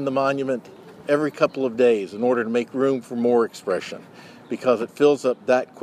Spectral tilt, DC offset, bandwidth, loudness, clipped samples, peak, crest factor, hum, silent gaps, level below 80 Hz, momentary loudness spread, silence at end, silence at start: -6 dB/octave; under 0.1%; 13 kHz; -22 LUFS; under 0.1%; -4 dBFS; 18 dB; none; none; -72 dBFS; 9 LU; 0 s; 0 s